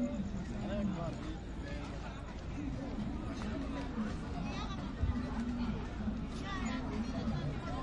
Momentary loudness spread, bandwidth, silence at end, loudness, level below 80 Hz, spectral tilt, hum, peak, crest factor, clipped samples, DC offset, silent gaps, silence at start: 6 LU; 10.5 kHz; 0 s; -40 LUFS; -44 dBFS; -7 dB/octave; none; -22 dBFS; 16 dB; under 0.1%; under 0.1%; none; 0 s